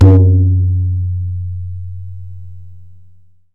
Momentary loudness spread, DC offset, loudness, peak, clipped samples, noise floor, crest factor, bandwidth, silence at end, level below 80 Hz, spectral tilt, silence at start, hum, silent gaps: 23 LU; 3%; -14 LUFS; 0 dBFS; under 0.1%; -46 dBFS; 14 dB; 2 kHz; 0 s; -34 dBFS; -11 dB/octave; 0 s; none; none